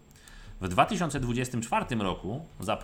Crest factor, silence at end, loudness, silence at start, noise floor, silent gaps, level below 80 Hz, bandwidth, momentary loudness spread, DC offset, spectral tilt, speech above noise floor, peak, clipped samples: 22 dB; 0 s; -30 LUFS; 0.1 s; -49 dBFS; none; -46 dBFS; 18.5 kHz; 12 LU; under 0.1%; -5 dB/octave; 20 dB; -8 dBFS; under 0.1%